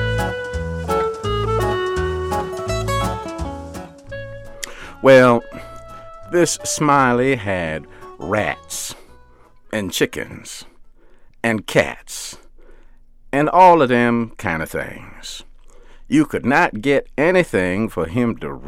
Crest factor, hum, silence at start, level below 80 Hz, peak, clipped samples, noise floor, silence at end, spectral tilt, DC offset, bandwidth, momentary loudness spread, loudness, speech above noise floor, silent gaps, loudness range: 18 dB; none; 0 s; -38 dBFS; -2 dBFS; under 0.1%; -46 dBFS; 0 s; -5 dB/octave; under 0.1%; 16.5 kHz; 19 LU; -18 LUFS; 29 dB; none; 8 LU